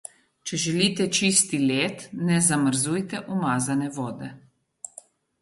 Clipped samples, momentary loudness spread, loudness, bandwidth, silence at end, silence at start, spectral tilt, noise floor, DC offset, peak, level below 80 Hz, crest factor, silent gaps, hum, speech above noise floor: under 0.1%; 20 LU; -23 LUFS; 12 kHz; 0.55 s; 0.45 s; -3.5 dB/octave; -51 dBFS; under 0.1%; -6 dBFS; -64 dBFS; 20 dB; none; none; 26 dB